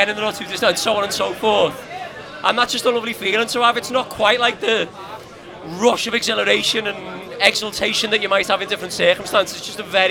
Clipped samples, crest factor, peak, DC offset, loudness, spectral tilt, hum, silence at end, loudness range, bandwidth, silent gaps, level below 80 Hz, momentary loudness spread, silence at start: under 0.1%; 20 dB; 0 dBFS; under 0.1%; -18 LUFS; -2 dB/octave; none; 0 s; 1 LU; 19.5 kHz; none; -54 dBFS; 15 LU; 0 s